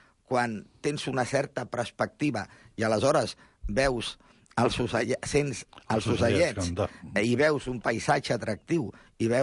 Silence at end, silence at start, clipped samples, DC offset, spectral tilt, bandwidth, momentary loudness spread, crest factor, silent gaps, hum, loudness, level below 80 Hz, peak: 0 s; 0.3 s; under 0.1%; under 0.1%; -5 dB/octave; 11.5 kHz; 9 LU; 16 dB; none; none; -28 LUFS; -48 dBFS; -12 dBFS